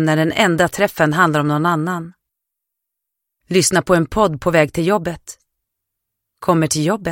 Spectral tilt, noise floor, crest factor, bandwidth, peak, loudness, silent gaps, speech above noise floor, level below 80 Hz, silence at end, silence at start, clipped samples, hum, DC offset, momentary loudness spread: -5 dB/octave; -80 dBFS; 18 dB; 17 kHz; 0 dBFS; -16 LUFS; none; 64 dB; -46 dBFS; 0 s; 0 s; under 0.1%; none; under 0.1%; 10 LU